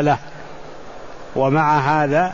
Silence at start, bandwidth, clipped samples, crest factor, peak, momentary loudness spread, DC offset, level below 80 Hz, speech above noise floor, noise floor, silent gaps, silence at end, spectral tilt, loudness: 0 s; 7.4 kHz; under 0.1%; 14 dB; -4 dBFS; 22 LU; 1%; -48 dBFS; 20 dB; -37 dBFS; none; 0 s; -7 dB/octave; -18 LUFS